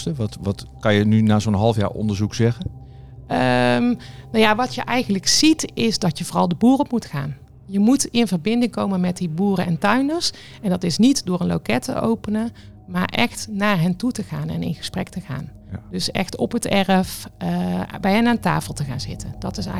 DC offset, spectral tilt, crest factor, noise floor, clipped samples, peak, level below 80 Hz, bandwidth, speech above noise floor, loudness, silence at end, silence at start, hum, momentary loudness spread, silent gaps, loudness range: 0.5%; -5 dB/octave; 18 dB; -39 dBFS; under 0.1%; -2 dBFS; -46 dBFS; 15.5 kHz; 19 dB; -20 LUFS; 0 s; 0 s; none; 12 LU; none; 5 LU